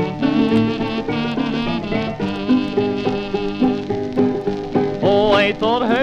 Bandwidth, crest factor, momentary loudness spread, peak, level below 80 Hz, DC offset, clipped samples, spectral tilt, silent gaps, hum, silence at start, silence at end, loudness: 8.2 kHz; 16 dB; 7 LU; -2 dBFS; -42 dBFS; under 0.1%; under 0.1%; -7 dB/octave; none; none; 0 s; 0 s; -19 LUFS